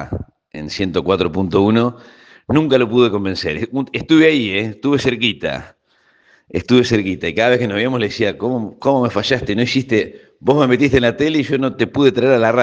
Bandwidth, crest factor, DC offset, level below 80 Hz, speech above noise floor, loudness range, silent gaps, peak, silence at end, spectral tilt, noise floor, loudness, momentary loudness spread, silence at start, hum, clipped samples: 8 kHz; 16 dB; under 0.1%; -46 dBFS; 42 dB; 2 LU; none; 0 dBFS; 0 s; -6 dB/octave; -57 dBFS; -16 LUFS; 9 LU; 0 s; none; under 0.1%